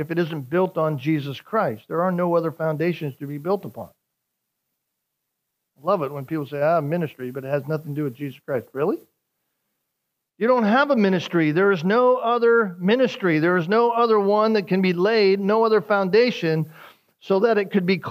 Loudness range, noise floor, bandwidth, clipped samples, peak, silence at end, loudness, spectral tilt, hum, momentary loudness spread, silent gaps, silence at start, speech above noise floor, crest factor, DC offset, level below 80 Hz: 10 LU; -80 dBFS; 15.5 kHz; under 0.1%; -6 dBFS; 0 s; -21 LUFS; -7.5 dB/octave; none; 11 LU; none; 0 s; 59 dB; 16 dB; under 0.1%; -76 dBFS